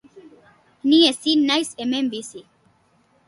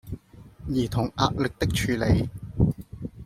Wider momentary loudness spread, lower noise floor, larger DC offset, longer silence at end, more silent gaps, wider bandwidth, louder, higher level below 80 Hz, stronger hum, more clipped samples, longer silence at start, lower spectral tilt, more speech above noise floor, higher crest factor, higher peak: second, 13 LU vs 16 LU; first, -61 dBFS vs -47 dBFS; neither; first, 0.85 s vs 0 s; neither; second, 11.5 kHz vs 16 kHz; first, -19 LUFS vs -26 LUFS; second, -68 dBFS vs -38 dBFS; neither; neither; about the same, 0.15 s vs 0.05 s; second, -2.5 dB/octave vs -6 dB/octave; first, 41 dB vs 23 dB; about the same, 18 dB vs 22 dB; about the same, -4 dBFS vs -4 dBFS